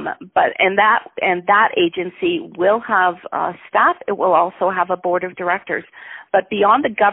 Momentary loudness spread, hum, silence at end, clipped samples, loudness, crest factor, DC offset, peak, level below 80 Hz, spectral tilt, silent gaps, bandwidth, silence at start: 8 LU; none; 0 s; under 0.1%; -17 LUFS; 16 dB; under 0.1%; 0 dBFS; -62 dBFS; -2 dB/octave; none; 4 kHz; 0 s